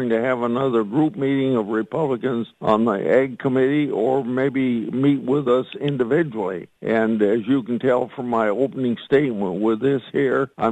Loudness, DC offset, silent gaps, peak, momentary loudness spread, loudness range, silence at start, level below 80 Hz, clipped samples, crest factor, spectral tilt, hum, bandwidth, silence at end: -21 LUFS; under 0.1%; none; -4 dBFS; 5 LU; 1 LU; 0 s; -62 dBFS; under 0.1%; 16 dB; -8.5 dB/octave; none; 8.8 kHz; 0 s